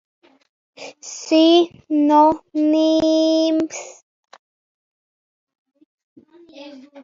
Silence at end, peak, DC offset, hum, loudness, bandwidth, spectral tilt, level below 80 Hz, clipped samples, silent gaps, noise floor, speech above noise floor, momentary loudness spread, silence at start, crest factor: 0.05 s; -2 dBFS; under 0.1%; none; -16 LUFS; 7.6 kHz; -3.5 dB/octave; -62 dBFS; under 0.1%; 4.03-4.23 s, 4.39-5.47 s, 5.58-5.65 s, 5.85-6.16 s; under -90 dBFS; over 73 dB; 24 LU; 0.8 s; 18 dB